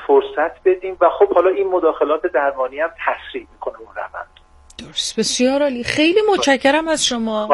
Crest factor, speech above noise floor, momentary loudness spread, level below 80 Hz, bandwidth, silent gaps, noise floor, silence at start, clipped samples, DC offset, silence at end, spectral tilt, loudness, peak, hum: 16 dB; 22 dB; 15 LU; -50 dBFS; 11.5 kHz; none; -40 dBFS; 0 s; under 0.1%; under 0.1%; 0 s; -2.5 dB/octave; -17 LUFS; 0 dBFS; none